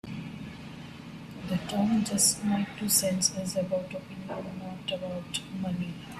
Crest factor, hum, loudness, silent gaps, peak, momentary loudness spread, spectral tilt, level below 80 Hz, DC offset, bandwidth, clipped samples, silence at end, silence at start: 20 dB; none; -29 LUFS; none; -10 dBFS; 19 LU; -3.5 dB/octave; -60 dBFS; under 0.1%; 15.5 kHz; under 0.1%; 0 s; 0.05 s